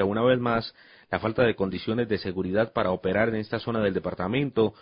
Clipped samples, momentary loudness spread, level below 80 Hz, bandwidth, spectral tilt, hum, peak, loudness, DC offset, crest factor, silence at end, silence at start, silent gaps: under 0.1%; 6 LU; -52 dBFS; 5.4 kHz; -11 dB/octave; none; -8 dBFS; -26 LUFS; under 0.1%; 18 dB; 0.1 s; 0 s; none